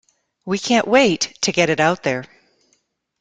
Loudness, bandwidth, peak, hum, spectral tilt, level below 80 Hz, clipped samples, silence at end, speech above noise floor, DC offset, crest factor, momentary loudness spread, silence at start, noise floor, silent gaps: -18 LUFS; 9.6 kHz; -2 dBFS; none; -3.5 dB/octave; -58 dBFS; under 0.1%; 0.95 s; 49 dB; under 0.1%; 18 dB; 11 LU; 0.45 s; -66 dBFS; none